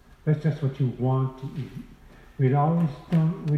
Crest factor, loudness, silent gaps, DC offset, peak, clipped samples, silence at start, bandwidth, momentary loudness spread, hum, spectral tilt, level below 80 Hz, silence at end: 16 dB; -25 LUFS; none; under 0.1%; -10 dBFS; under 0.1%; 0.25 s; 6 kHz; 13 LU; none; -10 dB/octave; -52 dBFS; 0 s